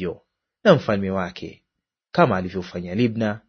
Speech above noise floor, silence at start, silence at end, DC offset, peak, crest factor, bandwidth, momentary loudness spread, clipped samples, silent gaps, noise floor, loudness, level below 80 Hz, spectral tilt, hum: 57 dB; 0 s; 0.1 s; under 0.1%; 0 dBFS; 22 dB; 6.6 kHz; 16 LU; under 0.1%; none; -78 dBFS; -22 LUFS; -56 dBFS; -7.5 dB/octave; none